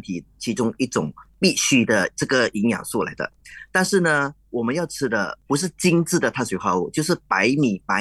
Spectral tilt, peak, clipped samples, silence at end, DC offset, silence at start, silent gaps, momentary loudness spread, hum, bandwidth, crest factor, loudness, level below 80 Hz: -4 dB/octave; -4 dBFS; under 0.1%; 0 s; under 0.1%; 0.05 s; none; 9 LU; none; 12.5 kHz; 18 dB; -21 LUFS; -56 dBFS